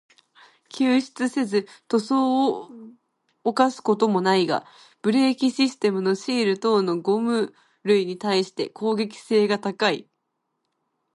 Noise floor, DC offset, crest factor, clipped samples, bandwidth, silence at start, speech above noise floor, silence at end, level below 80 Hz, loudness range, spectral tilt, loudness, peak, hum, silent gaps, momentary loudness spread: -77 dBFS; under 0.1%; 18 dB; under 0.1%; 11.5 kHz; 0.75 s; 55 dB; 1.1 s; -74 dBFS; 2 LU; -5 dB/octave; -23 LUFS; -4 dBFS; none; none; 8 LU